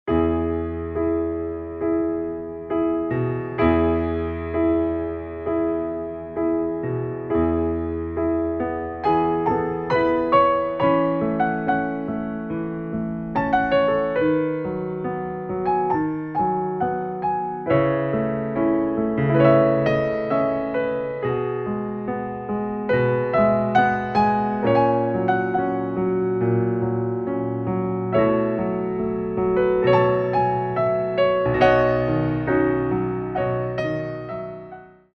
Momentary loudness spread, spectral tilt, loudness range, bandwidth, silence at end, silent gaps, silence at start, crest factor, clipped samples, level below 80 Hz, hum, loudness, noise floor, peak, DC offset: 9 LU; -9.5 dB/octave; 4 LU; 6.2 kHz; 0.25 s; none; 0.05 s; 18 dB; under 0.1%; -44 dBFS; none; -22 LUFS; -42 dBFS; -4 dBFS; under 0.1%